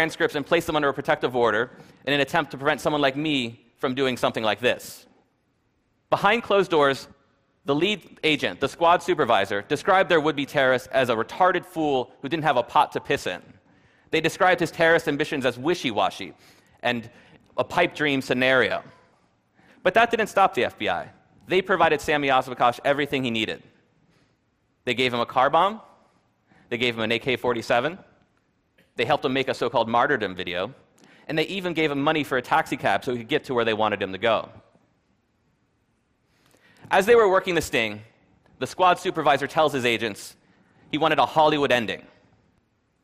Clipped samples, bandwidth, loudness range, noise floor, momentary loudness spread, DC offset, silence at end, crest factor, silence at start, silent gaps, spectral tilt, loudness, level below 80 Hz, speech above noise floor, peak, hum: under 0.1%; 15.5 kHz; 4 LU; -69 dBFS; 11 LU; under 0.1%; 1.05 s; 18 dB; 0 s; none; -4.5 dB/octave; -23 LUFS; -60 dBFS; 46 dB; -6 dBFS; none